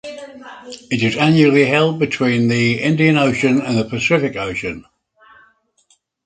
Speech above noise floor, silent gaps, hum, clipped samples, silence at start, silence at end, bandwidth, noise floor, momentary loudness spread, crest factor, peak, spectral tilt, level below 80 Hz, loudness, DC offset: 44 dB; none; none; under 0.1%; 0.05 s; 1.45 s; 9.2 kHz; -59 dBFS; 22 LU; 18 dB; 0 dBFS; -6 dB/octave; -52 dBFS; -15 LUFS; under 0.1%